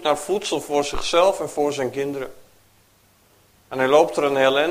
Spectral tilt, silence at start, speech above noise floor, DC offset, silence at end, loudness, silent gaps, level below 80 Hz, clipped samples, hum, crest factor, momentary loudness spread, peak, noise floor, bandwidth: -3.5 dB/octave; 0 s; 37 dB; under 0.1%; 0 s; -21 LUFS; none; -46 dBFS; under 0.1%; none; 20 dB; 11 LU; -2 dBFS; -57 dBFS; 15.5 kHz